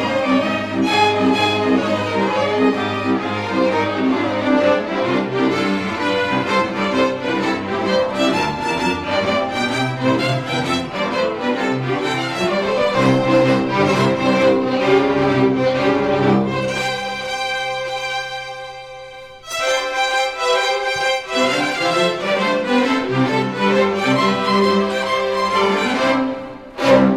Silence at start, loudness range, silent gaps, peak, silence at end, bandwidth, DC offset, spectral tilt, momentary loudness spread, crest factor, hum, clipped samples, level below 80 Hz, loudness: 0 s; 4 LU; none; -2 dBFS; 0 s; 14.5 kHz; under 0.1%; -5 dB/octave; 6 LU; 16 dB; none; under 0.1%; -50 dBFS; -18 LUFS